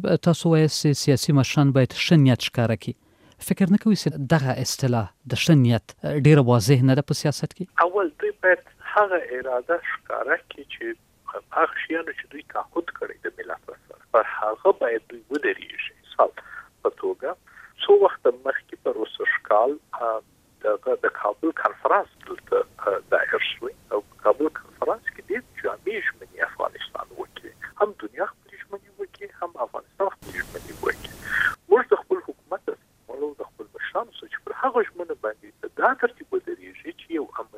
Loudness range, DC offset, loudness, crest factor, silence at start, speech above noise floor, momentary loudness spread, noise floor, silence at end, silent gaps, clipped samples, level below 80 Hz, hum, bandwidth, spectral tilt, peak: 9 LU; under 0.1%; -24 LUFS; 20 dB; 0 s; 18 dB; 17 LU; -41 dBFS; 0 s; none; under 0.1%; -58 dBFS; none; 16 kHz; -6 dB/octave; -4 dBFS